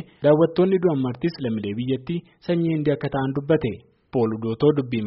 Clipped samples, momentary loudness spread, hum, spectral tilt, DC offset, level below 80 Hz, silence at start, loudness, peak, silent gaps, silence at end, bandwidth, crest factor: under 0.1%; 9 LU; none; -7 dB/octave; under 0.1%; -54 dBFS; 0 s; -23 LUFS; -6 dBFS; none; 0 s; 5.8 kHz; 16 dB